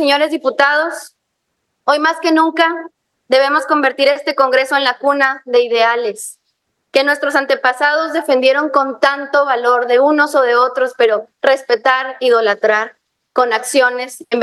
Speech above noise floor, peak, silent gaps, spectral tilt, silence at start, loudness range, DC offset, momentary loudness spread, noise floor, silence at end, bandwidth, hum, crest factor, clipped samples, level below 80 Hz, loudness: 57 dB; 0 dBFS; none; -1.5 dB/octave; 0 s; 2 LU; under 0.1%; 5 LU; -71 dBFS; 0 s; 12.5 kHz; none; 14 dB; under 0.1%; -74 dBFS; -14 LUFS